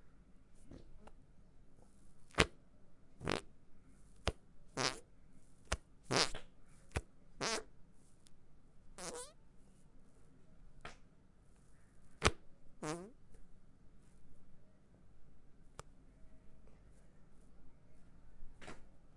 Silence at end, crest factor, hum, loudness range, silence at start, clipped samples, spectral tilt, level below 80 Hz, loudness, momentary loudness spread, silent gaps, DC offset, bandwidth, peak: 0 s; 40 dB; none; 23 LU; 0 s; under 0.1%; -3 dB/octave; -58 dBFS; -41 LUFS; 26 LU; none; under 0.1%; 11.5 kHz; -6 dBFS